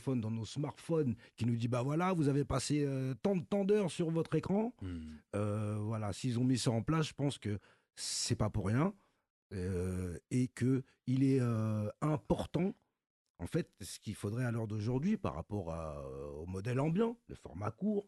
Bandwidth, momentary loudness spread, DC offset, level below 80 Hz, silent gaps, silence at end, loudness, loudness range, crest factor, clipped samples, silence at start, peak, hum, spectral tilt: 12 kHz; 10 LU; under 0.1%; -56 dBFS; 9.30-9.50 s, 13.10-13.35 s; 0.05 s; -36 LUFS; 4 LU; 16 dB; under 0.1%; 0 s; -18 dBFS; none; -6.5 dB/octave